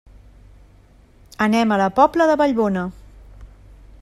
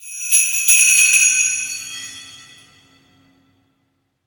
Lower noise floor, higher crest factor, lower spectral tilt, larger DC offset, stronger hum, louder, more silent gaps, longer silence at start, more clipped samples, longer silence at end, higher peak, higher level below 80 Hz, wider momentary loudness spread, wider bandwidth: second, -50 dBFS vs -68 dBFS; about the same, 18 dB vs 18 dB; first, -6 dB/octave vs 4.5 dB/octave; neither; neither; second, -18 LUFS vs -12 LUFS; neither; first, 1.4 s vs 0 s; neither; second, 0.55 s vs 1.9 s; about the same, -2 dBFS vs 0 dBFS; first, -46 dBFS vs -70 dBFS; second, 8 LU vs 21 LU; second, 14 kHz vs 19.5 kHz